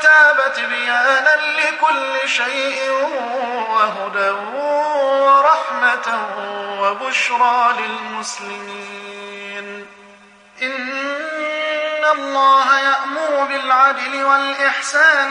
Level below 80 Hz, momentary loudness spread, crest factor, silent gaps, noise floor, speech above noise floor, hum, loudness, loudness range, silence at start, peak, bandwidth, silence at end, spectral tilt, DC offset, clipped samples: -74 dBFS; 15 LU; 16 dB; none; -45 dBFS; 28 dB; none; -16 LUFS; 9 LU; 0 s; -2 dBFS; 10.5 kHz; 0 s; -1 dB/octave; under 0.1%; under 0.1%